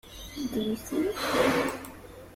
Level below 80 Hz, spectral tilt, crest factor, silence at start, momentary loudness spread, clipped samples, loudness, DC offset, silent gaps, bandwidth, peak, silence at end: -52 dBFS; -4 dB/octave; 18 dB; 0.05 s; 17 LU; under 0.1%; -29 LUFS; under 0.1%; none; 16.5 kHz; -12 dBFS; 0 s